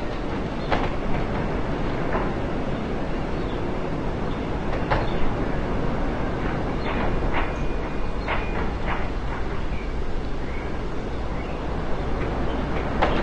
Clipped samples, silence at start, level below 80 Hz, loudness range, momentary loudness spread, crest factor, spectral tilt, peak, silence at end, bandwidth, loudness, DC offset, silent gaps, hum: under 0.1%; 0 s; -30 dBFS; 3 LU; 5 LU; 18 dB; -7 dB/octave; -6 dBFS; 0 s; 8 kHz; -28 LUFS; 1%; none; none